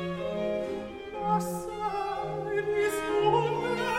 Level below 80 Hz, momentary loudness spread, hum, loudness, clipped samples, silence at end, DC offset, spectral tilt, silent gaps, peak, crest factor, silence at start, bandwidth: -56 dBFS; 9 LU; none; -30 LUFS; under 0.1%; 0 s; under 0.1%; -5.5 dB/octave; none; -12 dBFS; 18 dB; 0 s; 16 kHz